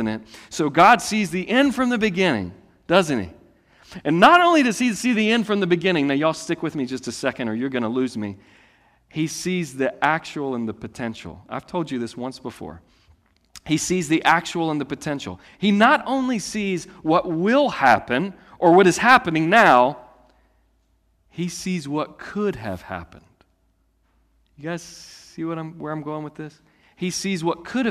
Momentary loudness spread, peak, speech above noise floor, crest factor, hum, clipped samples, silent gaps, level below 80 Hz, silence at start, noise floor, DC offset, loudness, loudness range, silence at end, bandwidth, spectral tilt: 19 LU; -2 dBFS; 44 dB; 20 dB; none; under 0.1%; none; -58 dBFS; 0 s; -65 dBFS; under 0.1%; -20 LUFS; 14 LU; 0 s; 15.5 kHz; -4.5 dB/octave